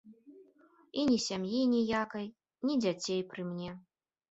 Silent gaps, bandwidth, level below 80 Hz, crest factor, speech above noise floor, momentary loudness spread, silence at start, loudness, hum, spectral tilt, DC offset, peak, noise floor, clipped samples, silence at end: none; 8.2 kHz; -70 dBFS; 16 dB; 32 dB; 13 LU; 0.05 s; -33 LUFS; none; -5 dB/octave; under 0.1%; -18 dBFS; -64 dBFS; under 0.1%; 0.5 s